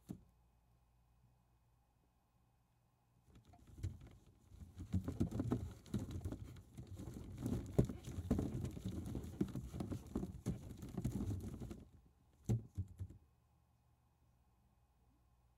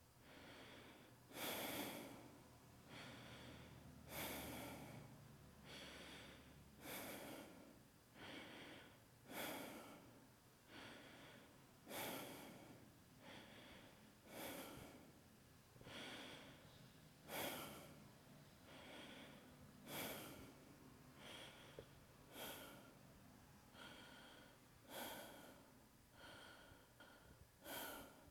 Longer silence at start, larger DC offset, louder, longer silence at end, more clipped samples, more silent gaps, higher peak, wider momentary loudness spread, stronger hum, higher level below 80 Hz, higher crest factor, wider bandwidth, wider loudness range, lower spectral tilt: about the same, 0.1 s vs 0 s; neither; first, -45 LUFS vs -56 LUFS; first, 2.4 s vs 0 s; neither; neither; first, -18 dBFS vs -34 dBFS; about the same, 16 LU vs 16 LU; neither; first, -58 dBFS vs -78 dBFS; first, 30 dB vs 22 dB; second, 16 kHz vs over 20 kHz; first, 14 LU vs 6 LU; first, -8 dB/octave vs -3 dB/octave